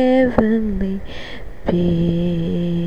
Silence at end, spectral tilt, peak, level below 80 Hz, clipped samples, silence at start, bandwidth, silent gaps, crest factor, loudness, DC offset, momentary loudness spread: 0 s; -9 dB/octave; 0 dBFS; -32 dBFS; under 0.1%; 0 s; 6.6 kHz; none; 18 dB; -19 LUFS; 3%; 16 LU